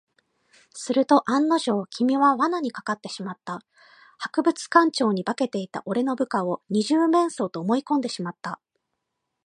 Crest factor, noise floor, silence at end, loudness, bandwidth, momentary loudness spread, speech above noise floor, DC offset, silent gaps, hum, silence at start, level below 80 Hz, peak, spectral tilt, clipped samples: 20 dB; -80 dBFS; 0.9 s; -23 LUFS; 11 kHz; 16 LU; 57 dB; under 0.1%; none; none; 0.75 s; -78 dBFS; -4 dBFS; -5 dB/octave; under 0.1%